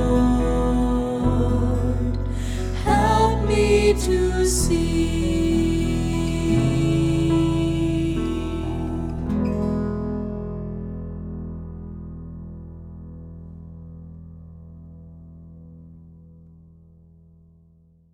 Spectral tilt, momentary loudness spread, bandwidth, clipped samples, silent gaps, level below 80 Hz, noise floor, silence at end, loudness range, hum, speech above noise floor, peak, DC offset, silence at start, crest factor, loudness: -6.5 dB/octave; 21 LU; 16 kHz; under 0.1%; none; -30 dBFS; -55 dBFS; 1.95 s; 21 LU; none; 35 dB; -6 dBFS; under 0.1%; 0 s; 16 dB; -22 LUFS